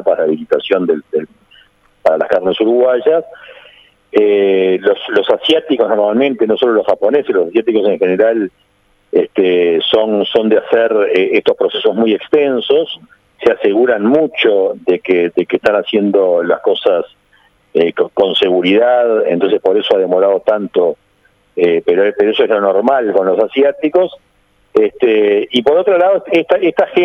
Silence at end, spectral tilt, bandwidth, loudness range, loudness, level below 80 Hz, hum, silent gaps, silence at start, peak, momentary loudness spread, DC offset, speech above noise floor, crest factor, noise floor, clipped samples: 0 s; -6.5 dB/octave; 6.2 kHz; 2 LU; -13 LUFS; -58 dBFS; none; none; 0 s; 0 dBFS; 5 LU; under 0.1%; 43 dB; 12 dB; -55 dBFS; under 0.1%